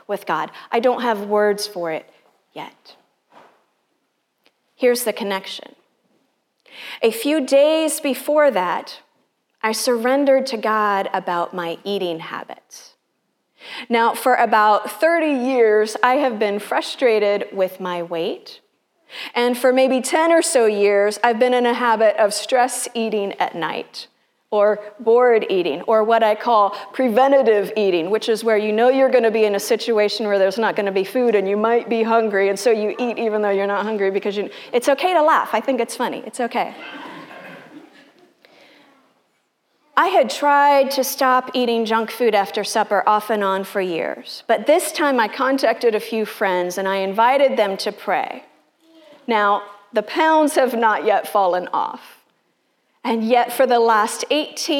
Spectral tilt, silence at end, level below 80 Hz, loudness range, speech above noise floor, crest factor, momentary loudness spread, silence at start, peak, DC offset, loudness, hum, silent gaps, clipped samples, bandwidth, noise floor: -3.5 dB/octave; 0 s; -84 dBFS; 8 LU; 52 dB; 18 dB; 11 LU; 0.1 s; 0 dBFS; under 0.1%; -18 LUFS; none; none; under 0.1%; 17.5 kHz; -70 dBFS